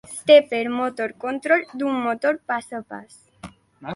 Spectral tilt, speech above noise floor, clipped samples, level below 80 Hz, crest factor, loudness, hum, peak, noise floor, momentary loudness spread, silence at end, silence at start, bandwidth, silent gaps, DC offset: -4 dB/octave; 23 dB; under 0.1%; -64 dBFS; 20 dB; -21 LUFS; none; -2 dBFS; -44 dBFS; 19 LU; 0 s; 0.1 s; 11.5 kHz; none; under 0.1%